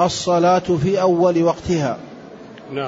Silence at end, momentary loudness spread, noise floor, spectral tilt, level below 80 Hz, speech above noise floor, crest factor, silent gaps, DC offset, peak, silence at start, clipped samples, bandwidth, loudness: 0 s; 22 LU; -38 dBFS; -6 dB/octave; -48 dBFS; 21 dB; 14 dB; none; under 0.1%; -4 dBFS; 0 s; under 0.1%; 8 kHz; -17 LUFS